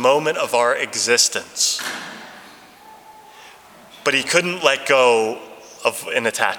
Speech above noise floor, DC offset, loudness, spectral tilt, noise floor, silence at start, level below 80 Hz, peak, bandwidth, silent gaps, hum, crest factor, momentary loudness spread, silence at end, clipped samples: 26 dB; under 0.1%; -18 LUFS; -1 dB/octave; -44 dBFS; 0 s; -70 dBFS; 0 dBFS; 20 kHz; none; none; 20 dB; 17 LU; 0 s; under 0.1%